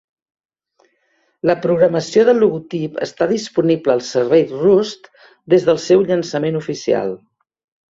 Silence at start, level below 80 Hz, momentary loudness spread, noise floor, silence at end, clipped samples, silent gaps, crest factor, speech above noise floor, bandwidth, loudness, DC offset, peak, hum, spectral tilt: 1.45 s; -60 dBFS; 10 LU; -63 dBFS; 0.75 s; under 0.1%; none; 16 dB; 48 dB; 7.8 kHz; -16 LUFS; under 0.1%; -2 dBFS; none; -6 dB/octave